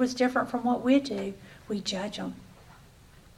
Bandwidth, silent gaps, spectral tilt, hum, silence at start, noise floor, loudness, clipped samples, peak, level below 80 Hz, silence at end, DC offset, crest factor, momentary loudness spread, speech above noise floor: 13 kHz; none; -4.5 dB/octave; none; 0 s; -54 dBFS; -29 LUFS; under 0.1%; -10 dBFS; -60 dBFS; 0.65 s; under 0.1%; 18 dB; 14 LU; 26 dB